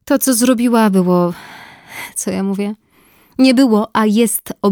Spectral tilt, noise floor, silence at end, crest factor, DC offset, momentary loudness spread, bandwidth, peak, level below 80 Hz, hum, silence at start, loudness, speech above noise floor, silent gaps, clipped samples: -5 dB/octave; -51 dBFS; 0 s; 14 dB; under 0.1%; 18 LU; over 20 kHz; -2 dBFS; -56 dBFS; none; 0.05 s; -14 LUFS; 38 dB; none; under 0.1%